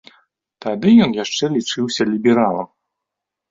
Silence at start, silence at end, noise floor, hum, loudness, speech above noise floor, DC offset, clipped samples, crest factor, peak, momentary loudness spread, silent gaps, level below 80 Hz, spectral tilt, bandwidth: 0.65 s; 0.85 s; -82 dBFS; none; -17 LUFS; 66 dB; under 0.1%; under 0.1%; 16 dB; -2 dBFS; 14 LU; none; -58 dBFS; -5 dB/octave; 7.6 kHz